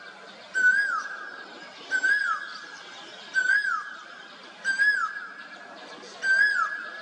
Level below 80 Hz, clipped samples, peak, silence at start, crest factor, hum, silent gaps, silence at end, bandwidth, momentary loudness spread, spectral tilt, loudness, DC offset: -84 dBFS; under 0.1%; -12 dBFS; 0 s; 16 dB; none; none; 0 s; 10 kHz; 21 LU; 0 dB/octave; -24 LUFS; under 0.1%